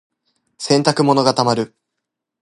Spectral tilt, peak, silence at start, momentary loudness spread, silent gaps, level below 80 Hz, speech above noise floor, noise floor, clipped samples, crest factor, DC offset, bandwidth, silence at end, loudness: -5 dB/octave; 0 dBFS; 0.6 s; 12 LU; none; -62 dBFS; 64 dB; -80 dBFS; under 0.1%; 18 dB; under 0.1%; 11.5 kHz; 0.75 s; -16 LUFS